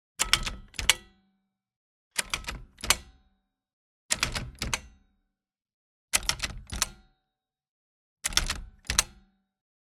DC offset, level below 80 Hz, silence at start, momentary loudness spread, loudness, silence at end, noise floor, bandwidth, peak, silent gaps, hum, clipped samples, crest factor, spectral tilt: under 0.1%; -44 dBFS; 0.2 s; 9 LU; -29 LUFS; 0.75 s; -86 dBFS; 19 kHz; -2 dBFS; 1.76-2.11 s, 3.73-4.09 s, 5.74-6.08 s, 7.69-8.17 s; none; under 0.1%; 32 dB; -0.5 dB/octave